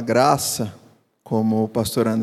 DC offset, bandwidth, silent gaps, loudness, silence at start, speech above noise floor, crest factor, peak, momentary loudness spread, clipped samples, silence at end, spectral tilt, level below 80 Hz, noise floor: under 0.1%; 15.5 kHz; none; -21 LUFS; 0 s; 30 dB; 18 dB; -2 dBFS; 9 LU; under 0.1%; 0 s; -5 dB/octave; -56 dBFS; -50 dBFS